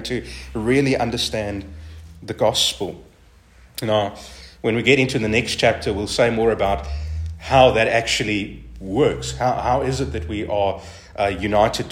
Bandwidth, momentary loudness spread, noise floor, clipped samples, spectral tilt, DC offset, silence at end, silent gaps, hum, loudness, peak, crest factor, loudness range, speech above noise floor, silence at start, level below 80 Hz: 16 kHz; 16 LU; -50 dBFS; under 0.1%; -4.5 dB/octave; under 0.1%; 0 s; none; none; -20 LUFS; 0 dBFS; 20 dB; 5 LU; 30 dB; 0 s; -38 dBFS